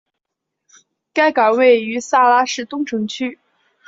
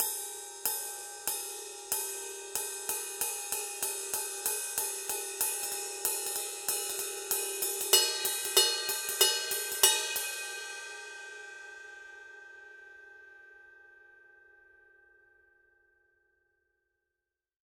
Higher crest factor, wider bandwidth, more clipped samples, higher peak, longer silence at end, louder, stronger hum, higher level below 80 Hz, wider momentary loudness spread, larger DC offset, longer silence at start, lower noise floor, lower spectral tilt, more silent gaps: second, 16 dB vs 28 dB; second, 7.8 kHz vs 18 kHz; neither; first, -2 dBFS vs -6 dBFS; second, 0.55 s vs 3.6 s; first, -16 LUFS vs -30 LUFS; neither; first, -68 dBFS vs -76 dBFS; second, 11 LU vs 22 LU; neither; first, 1.15 s vs 0 s; second, -79 dBFS vs -89 dBFS; first, -3.5 dB/octave vs 2 dB/octave; neither